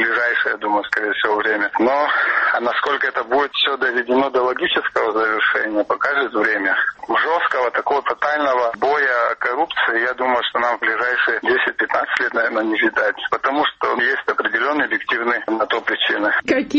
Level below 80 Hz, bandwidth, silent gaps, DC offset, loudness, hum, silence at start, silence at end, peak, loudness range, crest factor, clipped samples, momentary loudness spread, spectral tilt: -60 dBFS; 8.2 kHz; none; under 0.1%; -18 LUFS; none; 0 s; 0 s; 0 dBFS; 1 LU; 18 dB; under 0.1%; 3 LU; -3.5 dB/octave